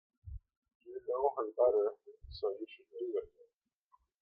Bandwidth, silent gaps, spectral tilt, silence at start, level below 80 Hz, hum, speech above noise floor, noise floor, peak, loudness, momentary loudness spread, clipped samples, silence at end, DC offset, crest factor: 5.2 kHz; 0.57-0.62 s, 0.75-0.80 s; -9 dB/octave; 0.25 s; -60 dBFS; none; 38 dB; -74 dBFS; -18 dBFS; -36 LUFS; 23 LU; under 0.1%; 0.95 s; under 0.1%; 20 dB